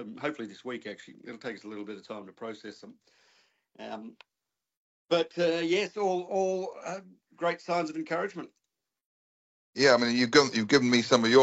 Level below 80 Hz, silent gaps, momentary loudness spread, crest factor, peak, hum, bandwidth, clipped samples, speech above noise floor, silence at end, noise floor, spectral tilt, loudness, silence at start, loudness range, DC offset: -72 dBFS; 4.77-5.06 s, 9.05-9.73 s; 21 LU; 22 dB; -8 dBFS; none; 8.2 kHz; under 0.1%; over 62 dB; 0 s; under -90 dBFS; -4 dB/octave; -27 LUFS; 0 s; 17 LU; under 0.1%